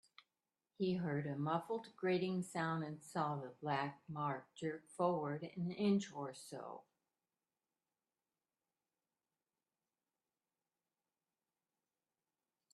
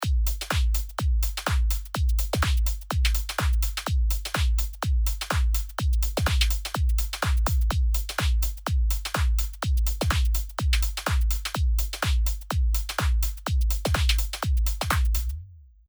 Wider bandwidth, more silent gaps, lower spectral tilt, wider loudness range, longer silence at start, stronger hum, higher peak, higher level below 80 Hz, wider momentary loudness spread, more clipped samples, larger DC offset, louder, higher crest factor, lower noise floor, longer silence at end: second, 12.5 kHz vs over 20 kHz; neither; first, -6.5 dB/octave vs -4 dB/octave; first, 9 LU vs 1 LU; first, 0.8 s vs 0 s; neither; second, -24 dBFS vs -6 dBFS; second, -84 dBFS vs -24 dBFS; first, 10 LU vs 3 LU; neither; neither; second, -41 LUFS vs -26 LUFS; about the same, 20 dB vs 18 dB; first, under -90 dBFS vs -45 dBFS; first, 5.95 s vs 0.3 s